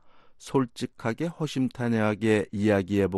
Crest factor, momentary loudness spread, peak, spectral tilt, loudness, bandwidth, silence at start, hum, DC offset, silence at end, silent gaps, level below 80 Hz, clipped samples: 16 dB; 8 LU; -10 dBFS; -6.5 dB/octave; -27 LUFS; 12.5 kHz; 0.05 s; none; under 0.1%; 0 s; none; -62 dBFS; under 0.1%